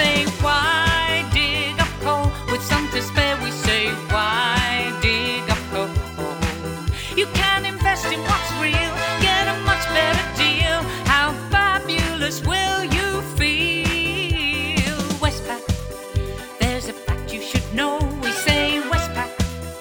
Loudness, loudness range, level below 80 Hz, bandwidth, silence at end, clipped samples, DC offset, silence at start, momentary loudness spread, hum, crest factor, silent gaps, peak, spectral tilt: -20 LUFS; 4 LU; -32 dBFS; over 20 kHz; 0 s; under 0.1%; under 0.1%; 0 s; 8 LU; none; 20 dB; none; -2 dBFS; -4 dB/octave